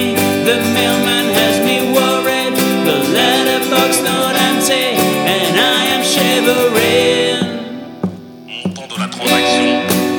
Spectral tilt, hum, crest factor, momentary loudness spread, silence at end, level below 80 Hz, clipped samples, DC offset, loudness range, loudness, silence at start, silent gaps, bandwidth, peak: -3 dB/octave; none; 14 dB; 12 LU; 0 s; -56 dBFS; under 0.1%; under 0.1%; 3 LU; -13 LUFS; 0 s; none; over 20 kHz; 0 dBFS